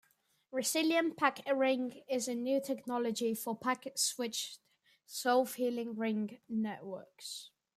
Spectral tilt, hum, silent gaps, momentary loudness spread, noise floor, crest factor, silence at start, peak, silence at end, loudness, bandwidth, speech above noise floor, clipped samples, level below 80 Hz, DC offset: -3 dB/octave; none; none; 13 LU; -71 dBFS; 22 dB; 0.5 s; -14 dBFS; 0.3 s; -35 LUFS; 15.5 kHz; 37 dB; under 0.1%; -86 dBFS; under 0.1%